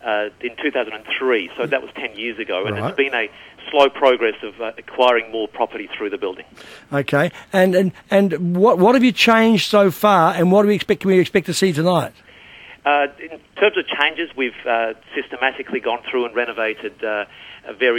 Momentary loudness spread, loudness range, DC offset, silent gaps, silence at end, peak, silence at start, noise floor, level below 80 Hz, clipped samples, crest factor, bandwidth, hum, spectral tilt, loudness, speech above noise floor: 13 LU; 7 LU; under 0.1%; none; 0 s; -2 dBFS; 0.05 s; -42 dBFS; -60 dBFS; under 0.1%; 18 dB; 17.5 kHz; none; -5.5 dB/octave; -18 LUFS; 24 dB